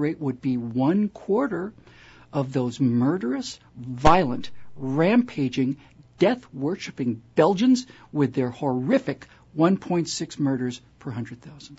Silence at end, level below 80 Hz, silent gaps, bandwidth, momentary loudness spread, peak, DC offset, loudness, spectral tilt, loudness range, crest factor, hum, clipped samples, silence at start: 0.05 s; -48 dBFS; none; 8 kHz; 15 LU; -4 dBFS; under 0.1%; -24 LUFS; -6.5 dB/octave; 2 LU; 20 dB; none; under 0.1%; 0 s